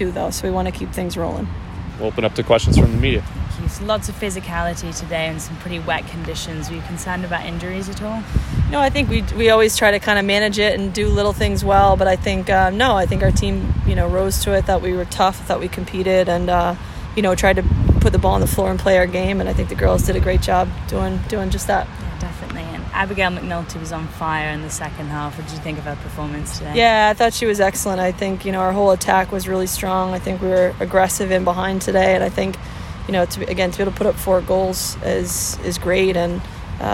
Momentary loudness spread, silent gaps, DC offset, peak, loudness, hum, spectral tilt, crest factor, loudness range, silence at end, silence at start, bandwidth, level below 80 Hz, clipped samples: 12 LU; none; under 0.1%; 0 dBFS; -19 LUFS; none; -5 dB/octave; 18 dB; 7 LU; 0 s; 0 s; 16.5 kHz; -28 dBFS; under 0.1%